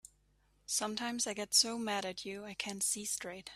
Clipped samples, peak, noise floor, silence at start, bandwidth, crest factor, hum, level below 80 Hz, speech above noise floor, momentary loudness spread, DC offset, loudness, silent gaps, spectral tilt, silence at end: under 0.1%; -16 dBFS; -72 dBFS; 0.7 s; 15.5 kHz; 22 dB; 50 Hz at -70 dBFS; -72 dBFS; 35 dB; 13 LU; under 0.1%; -34 LUFS; none; -1 dB/octave; 0 s